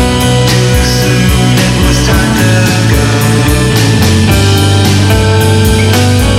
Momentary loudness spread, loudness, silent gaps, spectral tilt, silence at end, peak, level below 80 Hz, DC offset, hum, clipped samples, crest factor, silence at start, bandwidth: 1 LU; -8 LUFS; none; -5 dB/octave; 0 s; 0 dBFS; -18 dBFS; under 0.1%; none; under 0.1%; 8 dB; 0 s; 16.5 kHz